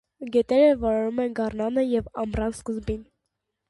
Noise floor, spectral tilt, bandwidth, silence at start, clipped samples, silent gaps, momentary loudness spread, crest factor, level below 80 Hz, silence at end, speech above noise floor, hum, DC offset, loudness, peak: -80 dBFS; -6.5 dB/octave; 11.5 kHz; 0.2 s; under 0.1%; none; 12 LU; 16 dB; -44 dBFS; 0.65 s; 57 dB; none; under 0.1%; -24 LUFS; -8 dBFS